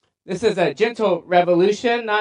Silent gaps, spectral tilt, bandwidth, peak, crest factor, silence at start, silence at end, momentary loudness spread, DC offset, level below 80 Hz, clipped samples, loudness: none; -5.5 dB/octave; 10.5 kHz; -4 dBFS; 14 dB; 0.25 s; 0 s; 5 LU; under 0.1%; -62 dBFS; under 0.1%; -19 LUFS